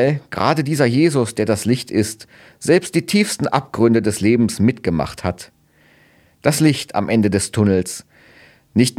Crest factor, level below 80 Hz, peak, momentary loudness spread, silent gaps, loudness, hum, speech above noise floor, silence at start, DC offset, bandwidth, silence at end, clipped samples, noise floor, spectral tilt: 18 dB; -48 dBFS; 0 dBFS; 9 LU; none; -18 LUFS; none; 36 dB; 0 s; under 0.1%; 16 kHz; 0.05 s; under 0.1%; -53 dBFS; -5.5 dB/octave